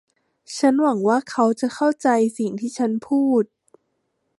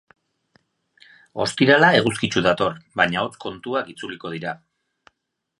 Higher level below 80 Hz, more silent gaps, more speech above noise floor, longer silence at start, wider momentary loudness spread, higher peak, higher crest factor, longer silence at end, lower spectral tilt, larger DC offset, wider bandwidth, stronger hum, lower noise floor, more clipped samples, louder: second, -74 dBFS vs -56 dBFS; neither; second, 53 dB vs 58 dB; second, 0.5 s vs 1.35 s; second, 7 LU vs 18 LU; second, -6 dBFS vs 0 dBFS; second, 16 dB vs 22 dB; about the same, 0.95 s vs 1.05 s; about the same, -5.5 dB/octave vs -4.5 dB/octave; neither; about the same, 11.5 kHz vs 11.5 kHz; neither; second, -72 dBFS vs -79 dBFS; neither; about the same, -20 LUFS vs -20 LUFS